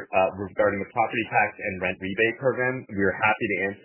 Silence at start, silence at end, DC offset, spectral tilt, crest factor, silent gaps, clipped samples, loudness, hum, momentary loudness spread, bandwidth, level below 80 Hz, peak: 0 s; 0.05 s; under 0.1%; -9 dB/octave; 18 dB; none; under 0.1%; -25 LUFS; none; 5 LU; 3.2 kHz; -54 dBFS; -8 dBFS